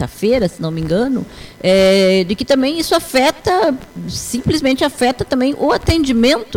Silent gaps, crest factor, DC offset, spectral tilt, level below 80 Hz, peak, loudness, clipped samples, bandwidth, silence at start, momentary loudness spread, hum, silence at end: none; 10 dB; under 0.1%; -5 dB/octave; -34 dBFS; -4 dBFS; -15 LUFS; under 0.1%; 18 kHz; 0 s; 9 LU; none; 0 s